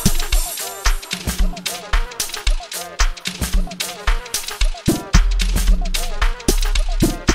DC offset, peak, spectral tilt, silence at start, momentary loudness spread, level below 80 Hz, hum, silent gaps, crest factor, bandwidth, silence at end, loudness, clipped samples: under 0.1%; 0 dBFS; -3.5 dB/octave; 0 s; 5 LU; -18 dBFS; none; none; 18 dB; 16.5 kHz; 0 s; -22 LUFS; under 0.1%